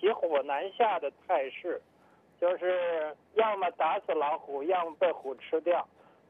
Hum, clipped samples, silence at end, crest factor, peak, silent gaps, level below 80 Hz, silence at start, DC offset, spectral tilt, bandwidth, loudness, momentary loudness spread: none; under 0.1%; 0.45 s; 16 dB; -14 dBFS; none; -84 dBFS; 0 s; under 0.1%; -6 dB/octave; 3.8 kHz; -31 LUFS; 7 LU